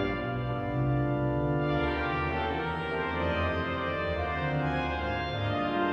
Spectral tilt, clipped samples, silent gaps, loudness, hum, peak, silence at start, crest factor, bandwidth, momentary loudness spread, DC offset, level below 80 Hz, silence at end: -8 dB/octave; under 0.1%; none; -30 LUFS; none; -16 dBFS; 0 s; 12 dB; 6.6 kHz; 3 LU; under 0.1%; -42 dBFS; 0 s